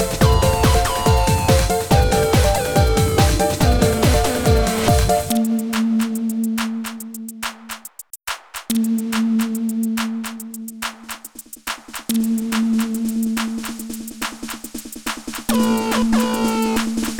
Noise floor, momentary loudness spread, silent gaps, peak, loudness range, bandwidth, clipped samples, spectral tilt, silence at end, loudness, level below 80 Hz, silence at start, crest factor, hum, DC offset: -39 dBFS; 14 LU; none; -2 dBFS; 8 LU; over 20 kHz; under 0.1%; -5 dB/octave; 0 s; -19 LUFS; -26 dBFS; 0 s; 18 dB; none; under 0.1%